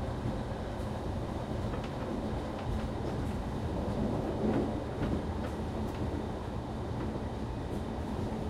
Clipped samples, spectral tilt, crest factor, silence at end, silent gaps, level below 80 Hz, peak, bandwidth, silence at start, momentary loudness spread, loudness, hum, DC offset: under 0.1%; -7.5 dB/octave; 16 dB; 0 s; none; -42 dBFS; -18 dBFS; 14 kHz; 0 s; 5 LU; -36 LUFS; none; under 0.1%